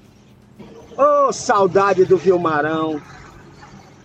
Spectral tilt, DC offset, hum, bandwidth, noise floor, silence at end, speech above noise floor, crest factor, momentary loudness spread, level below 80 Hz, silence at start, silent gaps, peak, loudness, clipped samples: -5.5 dB/octave; under 0.1%; none; 8.6 kHz; -48 dBFS; 0.3 s; 32 dB; 14 dB; 10 LU; -54 dBFS; 0.6 s; none; -4 dBFS; -16 LUFS; under 0.1%